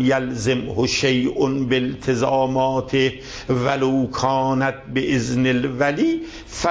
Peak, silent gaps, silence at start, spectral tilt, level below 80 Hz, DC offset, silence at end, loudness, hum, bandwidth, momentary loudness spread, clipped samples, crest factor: -6 dBFS; none; 0 s; -5.5 dB/octave; -44 dBFS; under 0.1%; 0 s; -20 LUFS; none; 8 kHz; 4 LU; under 0.1%; 14 dB